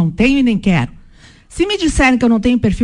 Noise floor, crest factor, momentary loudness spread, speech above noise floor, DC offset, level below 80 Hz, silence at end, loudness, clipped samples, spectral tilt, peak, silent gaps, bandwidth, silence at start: -42 dBFS; 12 dB; 8 LU; 29 dB; under 0.1%; -28 dBFS; 0 s; -14 LUFS; under 0.1%; -5.5 dB/octave; -2 dBFS; none; 11 kHz; 0 s